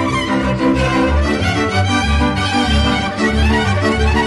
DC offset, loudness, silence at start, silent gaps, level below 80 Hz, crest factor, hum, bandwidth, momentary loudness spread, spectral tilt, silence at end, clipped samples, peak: under 0.1%; -15 LUFS; 0 s; none; -22 dBFS; 10 dB; none; 11.5 kHz; 2 LU; -5.5 dB/octave; 0 s; under 0.1%; -6 dBFS